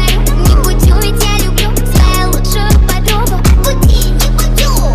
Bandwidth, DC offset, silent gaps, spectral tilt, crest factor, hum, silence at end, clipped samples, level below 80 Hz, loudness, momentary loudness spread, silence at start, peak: 16 kHz; under 0.1%; none; -4.5 dB/octave; 8 dB; none; 0 s; under 0.1%; -10 dBFS; -11 LUFS; 3 LU; 0 s; 0 dBFS